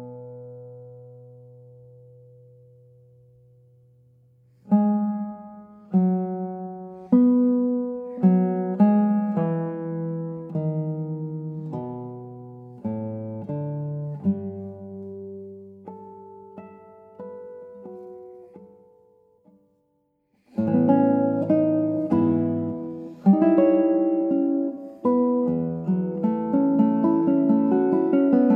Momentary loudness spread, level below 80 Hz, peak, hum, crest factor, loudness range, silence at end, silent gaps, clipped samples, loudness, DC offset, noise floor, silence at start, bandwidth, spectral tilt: 23 LU; -70 dBFS; -6 dBFS; none; 18 dB; 20 LU; 0 s; none; under 0.1%; -23 LUFS; under 0.1%; -70 dBFS; 0 s; 3.1 kHz; -12.5 dB/octave